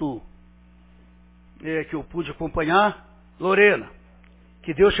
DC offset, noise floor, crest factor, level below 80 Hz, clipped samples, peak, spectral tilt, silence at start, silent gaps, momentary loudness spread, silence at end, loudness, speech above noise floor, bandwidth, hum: under 0.1%; -51 dBFS; 22 dB; -46 dBFS; under 0.1%; -2 dBFS; -9 dB/octave; 0 s; none; 21 LU; 0 s; -22 LUFS; 30 dB; 4 kHz; 60 Hz at -50 dBFS